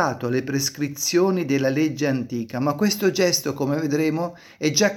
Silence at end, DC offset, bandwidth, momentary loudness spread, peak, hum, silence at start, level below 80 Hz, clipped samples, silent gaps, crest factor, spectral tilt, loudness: 0 s; under 0.1%; 17 kHz; 6 LU; -4 dBFS; none; 0 s; -64 dBFS; under 0.1%; none; 18 dB; -4 dB/octave; -22 LUFS